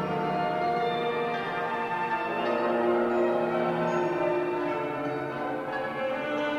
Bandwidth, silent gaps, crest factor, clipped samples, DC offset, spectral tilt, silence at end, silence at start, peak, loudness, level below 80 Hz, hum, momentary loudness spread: 11 kHz; none; 14 dB; under 0.1%; under 0.1%; -6.5 dB/octave; 0 s; 0 s; -14 dBFS; -28 LUFS; -64 dBFS; none; 6 LU